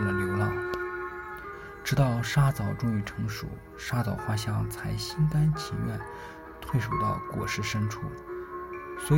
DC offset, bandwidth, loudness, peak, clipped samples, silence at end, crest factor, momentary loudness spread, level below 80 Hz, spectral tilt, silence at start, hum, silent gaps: under 0.1%; 16.5 kHz; -30 LUFS; -12 dBFS; under 0.1%; 0 s; 18 dB; 14 LU; -46 dBFS; -6 dB/octave; 0 s; none; none